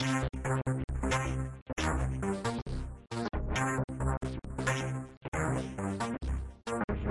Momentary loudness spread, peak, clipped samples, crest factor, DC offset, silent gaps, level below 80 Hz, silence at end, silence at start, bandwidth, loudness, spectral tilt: 7 LU; -16 dBFS; under 0.1%; 16 dB; under 0.1%; 0.84-0.88 s, 1.62-1.66 s, 2.62-2.66 s, 3.84-3.88 s, 5.17-5.21 s, 5.28-5.32 s, 6.84-6.88 s; -40 dBFS; 0 s; 0 s; 11.5 kHz; -35 LUFS; -5.5 dB/octave